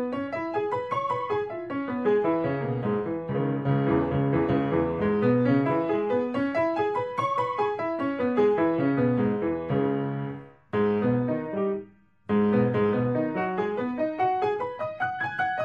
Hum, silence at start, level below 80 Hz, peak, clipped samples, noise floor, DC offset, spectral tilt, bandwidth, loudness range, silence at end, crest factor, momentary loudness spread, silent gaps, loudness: none; 0 s; -56 dBFS; -10 dBFS; under 0.1%; -47 dBFS; under 0.1%; -9 dB/octave; 7 kHz; 3 LU; 0 s; 14 dB; 7 LU; none; -26 LUFS